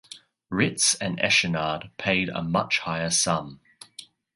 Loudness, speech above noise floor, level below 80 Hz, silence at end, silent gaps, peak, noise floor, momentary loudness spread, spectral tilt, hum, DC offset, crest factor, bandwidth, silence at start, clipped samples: -24 LUFS; 24 dB; -56 dBFS; 0.3 s; none; -6 dBFS; -49 dBFS; 22 LU; -2.5 dB/octave; none; under 0.1%; 20 dB; 11.5 kHz; 0.1 s; under 0.1%